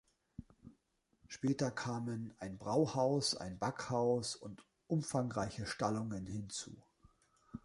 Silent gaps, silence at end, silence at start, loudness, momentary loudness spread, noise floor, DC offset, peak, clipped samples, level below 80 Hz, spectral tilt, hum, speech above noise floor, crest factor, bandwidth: none; 0.05 s; 0.4 s; -38 LUFS; 20 LU; -78 dBFS; under 0.1%; -20 dBFS; under 0.1%; -66 dBFS; -5 dB/octave; none; 40 dB; 20 dB; 11.5 kHz